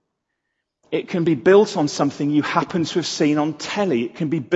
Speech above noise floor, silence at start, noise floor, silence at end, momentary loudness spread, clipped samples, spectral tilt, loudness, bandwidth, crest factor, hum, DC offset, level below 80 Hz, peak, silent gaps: 58 dB; 0.9 s; -77 dBFS; 0 s; 10 LU; under 0.1%; -5.5 dB/octave; -20 LUFS; 8.2 kHz; 18 dB; none; under 0.1%; -64 dBFS; -2 dBFS; none